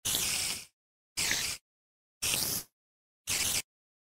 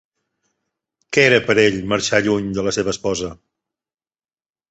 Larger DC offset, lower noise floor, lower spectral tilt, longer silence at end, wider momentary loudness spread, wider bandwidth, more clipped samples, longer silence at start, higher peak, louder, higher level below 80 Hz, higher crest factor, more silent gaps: neither; about the same, under -90 dBFS vs under -90 dBFS; second, 0 dB/octave vs -4 dB/octave; second, 0.45 s vs 1.35 s; first, 14 LU vs 9 LU; first, 16 kHz vs 8.2 kHz; neither; second, 0.05 s vs 1.1 s; second, -12 dBFS vs -2 dBFS; second, -31 LUFS vs -17 LUFS; second, -58 dBFS vs -50 dBFS; about the same, 24 dB vs 20 dB; first, 0.73-1.16 s, 1.61-2.21 s, 2.73-3.25 s vs none